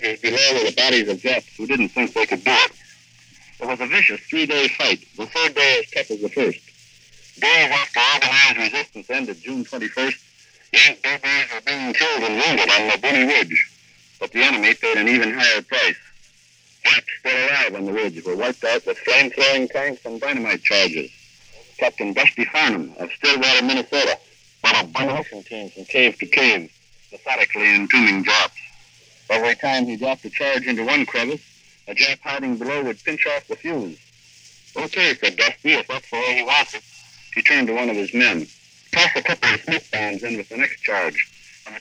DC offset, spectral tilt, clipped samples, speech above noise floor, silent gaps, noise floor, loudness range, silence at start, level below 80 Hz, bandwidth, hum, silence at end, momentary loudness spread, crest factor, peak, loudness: under 0.1%; -2 dB/octave; under 0.1%; 35 dB; none; -54 dBFS; 4 LU; 0 s; -66 dBFS; 11 kHz; none; 0 s; 12 LU; 20 dB; -2 dBFS; -18 LUFS